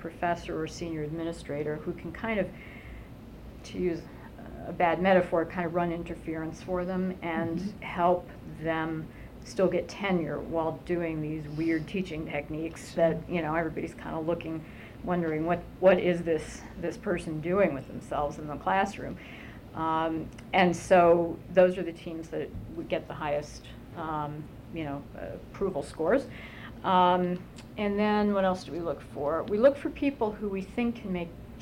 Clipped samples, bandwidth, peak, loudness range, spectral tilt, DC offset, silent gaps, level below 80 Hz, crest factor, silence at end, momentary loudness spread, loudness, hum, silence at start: under 0.1%; 16 kHz; -10 dBFS; 8 LU; -6.5 dB/octave; under 0.1%; none; -50 dBFS; 20 dB; 0 s; 17 LU; -30 LUFS; none; 0 s